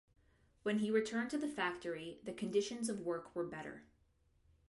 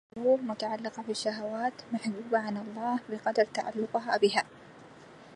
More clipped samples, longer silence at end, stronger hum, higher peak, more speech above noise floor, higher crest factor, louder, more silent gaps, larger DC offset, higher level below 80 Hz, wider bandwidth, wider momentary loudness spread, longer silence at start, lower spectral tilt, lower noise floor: neither; first, 0.85 s vs 0 s; neither; second, -22 dBFS vs -12 dBFS; first, 35 dB vs 21 dB; about the same, 18 dB vs 20 dB; second, -40 LUFS vs -31 LUFS; neither; neither; about the same, -74 dBFS vs -76 dBFS; about the same, 11.5 kHz vs 11.5 kHz; first, 11 LU vs 8 LU; first, 0.65 s vs 0.15 s; about the same, -4.5 dB/octave vs -4.5 dB/octave; first, -74 dBFS vs -52 dBFS